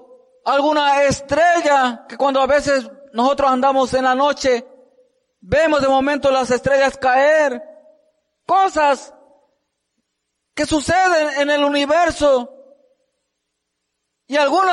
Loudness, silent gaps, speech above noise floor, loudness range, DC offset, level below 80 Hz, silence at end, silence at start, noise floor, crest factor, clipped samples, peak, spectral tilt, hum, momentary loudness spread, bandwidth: -16 LUFS; none; 60 dB; 4 LU; under 0.1%; -46 dBFS; 0 s; 0.45 s; -76 dBFS; 12 dB; under 0.1%; -6 dBFS; -3.5 dB/octave; none; 7 LU; 11.5 kHz